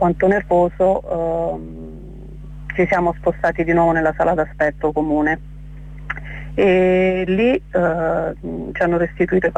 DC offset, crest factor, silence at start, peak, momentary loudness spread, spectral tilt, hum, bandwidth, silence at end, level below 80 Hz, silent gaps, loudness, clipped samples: under 0.1%; 12 dB; 0 s; -6 dBFS; 19 LU; -8 dB/octave; 50 Hz at -35 dBFS; 8.8 kHz; 0 s; -36 dBFS; none; -18 LUFS; under 0.1%